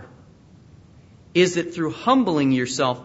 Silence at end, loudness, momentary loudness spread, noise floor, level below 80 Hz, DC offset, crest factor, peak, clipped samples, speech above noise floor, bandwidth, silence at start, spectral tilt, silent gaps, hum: 0 s; -21 LUFS; 6 LU; -49 dBFS; -60 dBFS; under 0.1%; 18 dB; -4 dBFS; under 0.1%; 29 dB; 8 kHz; 0 s; -5 dB/octave; none; none